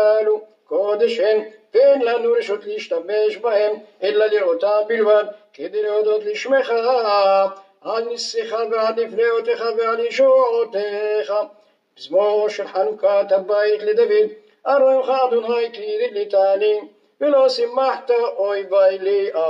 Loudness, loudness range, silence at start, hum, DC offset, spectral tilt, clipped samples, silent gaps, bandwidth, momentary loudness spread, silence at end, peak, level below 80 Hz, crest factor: -19 LUFS; 1 LU; 0 s; none; under 0.1%; -3.5 dB/octave; under 0.1%; none; 7.8 kHz; 9 LU; 0 s; -4 dBFS; -86 dBFS; 14 dB